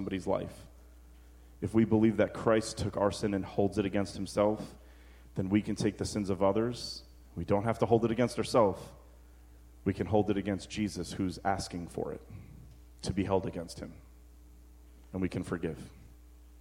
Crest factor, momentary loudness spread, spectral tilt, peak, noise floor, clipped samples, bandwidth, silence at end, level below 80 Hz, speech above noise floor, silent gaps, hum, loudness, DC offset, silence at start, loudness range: 22 dB; 17 LU; -6.5 dB/octave; -12 dBFS; -55 dBFS; under 0.1%; 16 kHz; 0 s; -54 dBFS; 24 dB; none; none; -32 LUFS; under 0.1%; 0 s; 8 LU